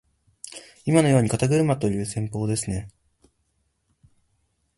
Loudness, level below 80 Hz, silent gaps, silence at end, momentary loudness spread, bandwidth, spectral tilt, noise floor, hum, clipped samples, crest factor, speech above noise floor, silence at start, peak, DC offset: -23 LUFS; -50 dBFS; none; 1.9 s; 21 LU; 11.5 kHz; -6 dB/octave; -71 dBFS; none; under 0.1%; 22 dB; 49 dB; 0.45 s; -4 dBFS; under 0.1%